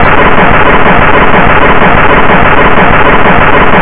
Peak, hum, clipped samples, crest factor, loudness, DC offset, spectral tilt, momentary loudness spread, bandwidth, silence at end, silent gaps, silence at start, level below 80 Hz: 0 dBFS; none; 0.3%; 6 dB; -4 LUFS; 40%; -9 dB/octave; 0 LU; 4 kHz; 0 s; none; 0 s; -16 dBFS